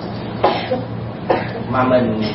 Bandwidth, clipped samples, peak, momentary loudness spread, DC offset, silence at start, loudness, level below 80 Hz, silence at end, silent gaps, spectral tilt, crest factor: 5.8 kHz; under 0.1%; -2 dBFS; 11 LU; under 0.1%; 0 s; -19 LUFS; -44 dBFS; 0 s; none; -11 dB/octave; 18 dB